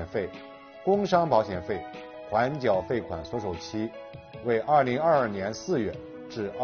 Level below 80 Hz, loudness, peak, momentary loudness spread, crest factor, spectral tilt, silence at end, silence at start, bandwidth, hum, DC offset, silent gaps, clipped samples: -56 dBFS; -27 LUFS; -10 dBFS; 17 LU; 18 dB; -5 dB/octave; 0 s; 0 s; 6.8 kHz; none; under 0.1%; none; under 0.1%